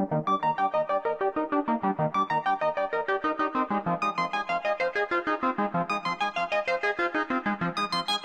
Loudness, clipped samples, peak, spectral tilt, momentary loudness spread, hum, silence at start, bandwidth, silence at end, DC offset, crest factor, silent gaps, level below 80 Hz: -27 LUFS; under 0.1%; -14 dBFS; -5.5 dB/octave; 3 LU; none; 0 s; 13 kHz; 0 s; under 0.1%; 14 dB; none; -64 dBFS